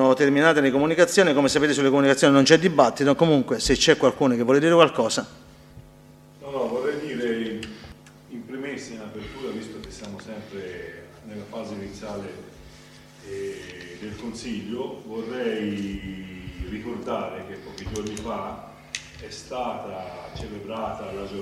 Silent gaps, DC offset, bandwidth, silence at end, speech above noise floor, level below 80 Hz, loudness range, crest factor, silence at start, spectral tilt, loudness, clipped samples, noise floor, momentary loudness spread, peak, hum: none; under 0.1%; 14 kHz; 0 s; 28 dB; -48 dBFS; 18 LU; 24 dB; 0 s; -4.5 dB/octave; -22 LUFS; under 0.1%; -49 dBFS; 20 LU; 0 dBFS; none